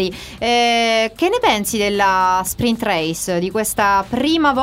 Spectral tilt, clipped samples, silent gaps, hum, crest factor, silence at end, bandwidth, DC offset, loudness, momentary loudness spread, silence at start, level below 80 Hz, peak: -3.5 dB/octave; under 0.1%; none; none; 14 dB; 0 s; 16 kHz; under 0.1%; -17 LUFS; 5 LU; 0 s; -44 dBFS; -2 dBFS